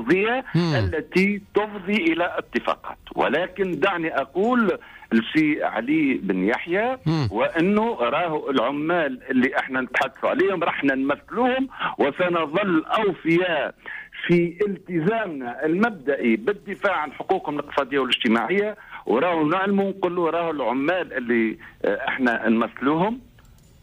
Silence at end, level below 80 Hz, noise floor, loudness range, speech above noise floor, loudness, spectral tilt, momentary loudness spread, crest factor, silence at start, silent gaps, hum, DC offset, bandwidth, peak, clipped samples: 0.65 s; -56 dBFS; -51 dBFS; 1 LU; 28 dB; -23 LUFS; -7 dB/octave; 6 LU; 14 dB; 0 s; none; none; under 0.1%; 15 kHz; -10 dBFS; under 0.1%